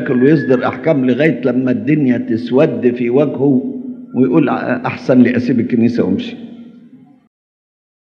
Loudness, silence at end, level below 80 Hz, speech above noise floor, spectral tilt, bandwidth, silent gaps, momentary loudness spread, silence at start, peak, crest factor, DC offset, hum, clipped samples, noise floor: -14 LUFS; 1.15 s; -68 dBFS; 29 dB; -9 dB/octave; 6.4 kHz; none; 8 LU; 0 s; 0 dBFS; 14 dB; under 0.1%; none; under 0.1%; -42 dBFS